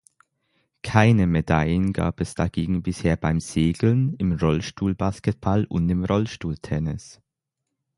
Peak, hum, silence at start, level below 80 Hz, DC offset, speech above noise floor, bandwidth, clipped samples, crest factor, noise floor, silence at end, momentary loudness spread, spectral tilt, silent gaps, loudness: 0 dBFS; none; 0.85 s; -38 dBFS; under 0.1%; 60 dB; 11.5 kHz; under 0.1%; 22 dB; -82 dBFS; 0.85 s; 8 LU; -7 dB/octave; none; -23 LUFS